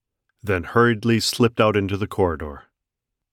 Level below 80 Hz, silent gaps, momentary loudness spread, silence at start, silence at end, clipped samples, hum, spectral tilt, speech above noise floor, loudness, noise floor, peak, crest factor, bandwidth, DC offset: -46 dBFS; none; 12 LU; 0.45 s; 0.75 s; under 0.1%; none; -5.5 dB/octave; 63 dB; -20 LUFS; -83 dBFS; -4 dBFS; 18 dB; 16.5 kHz; under 0.1%